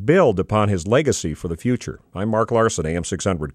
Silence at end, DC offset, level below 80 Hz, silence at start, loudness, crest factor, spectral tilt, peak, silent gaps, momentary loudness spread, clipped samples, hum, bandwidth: 0.05 s; under 0.1%; -42 dBFS; 0 s; -20 LUFS; 16 dB; -5.5 dB/octave; -4 dBFS; none; 9 LU; under 0.1%; none; 13.5 kHz